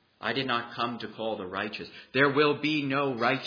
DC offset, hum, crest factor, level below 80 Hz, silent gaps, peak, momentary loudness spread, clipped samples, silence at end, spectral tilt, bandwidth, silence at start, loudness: under 0.1%; none; 20 dB; -72 dBFS; none; -10 dBFS; 10 LU; under 0.1%; 0 s; -6.5 dB/octave; 5.4 kHz; 0.2 s; -28 LUFS